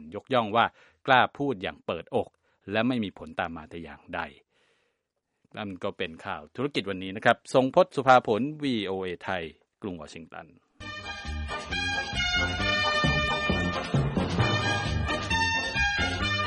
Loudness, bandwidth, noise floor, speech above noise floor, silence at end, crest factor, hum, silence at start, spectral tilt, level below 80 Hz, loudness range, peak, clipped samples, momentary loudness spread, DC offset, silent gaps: -27 LUFS; 11.5 kHz; -80 dBFS; 53 dB; 0 s; 24 dB; none; 0 s; -5 dB/octave; -44 dBFS; 10 LU; -4 dBFS; under 0.1%; 16 LU; under 0.1%; none